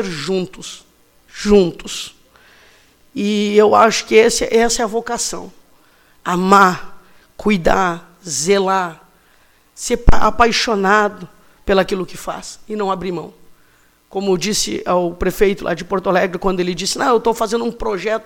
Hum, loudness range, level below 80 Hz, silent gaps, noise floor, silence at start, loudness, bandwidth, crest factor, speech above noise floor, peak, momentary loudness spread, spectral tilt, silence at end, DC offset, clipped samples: none; 6 LU; -32 dBFS; none; -53 dBFS; 0 s; -16 LUFS; 17 kHz; 16 dB; 38 dB; 0 dBFS; 16 LU; -4 dB/octave; 0.05 s; under 0.1%; under 0.1%